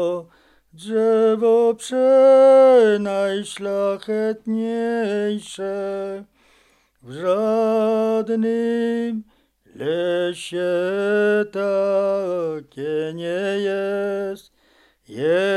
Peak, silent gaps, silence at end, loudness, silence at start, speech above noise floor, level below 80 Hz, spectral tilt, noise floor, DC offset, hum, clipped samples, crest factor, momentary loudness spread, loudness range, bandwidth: -4 dBFS; none; 0 s; -20 LUFS; 0 s; 40 dB; -66 dBFS; -5.5 dB/octave; -59 dBFS; under 0.1%; none; under 0.1%; 16 dB; 14 LU; 9 LU; 12 kHz